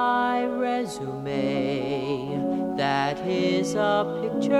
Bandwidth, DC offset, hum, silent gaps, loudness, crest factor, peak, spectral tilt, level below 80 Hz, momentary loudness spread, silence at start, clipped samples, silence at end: 13 kHz; under 0.1%; none; none; -26 LUFS; 16 dB; -8 dBFS; -5.5 dB/octave; -60 dBFS; 5 LU; 0 s; under 0.1%; 0 s